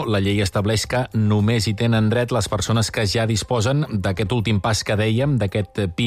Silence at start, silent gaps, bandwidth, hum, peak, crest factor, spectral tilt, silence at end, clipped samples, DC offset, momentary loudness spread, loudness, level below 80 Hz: 0 s; none; 14.5 kHz; none; -10 dBFS; 10 dB; -5.5 dB/octave; 0 s; under 0.1%; under 0.1%; 3 LU; -20 LUFS; -42 dBFS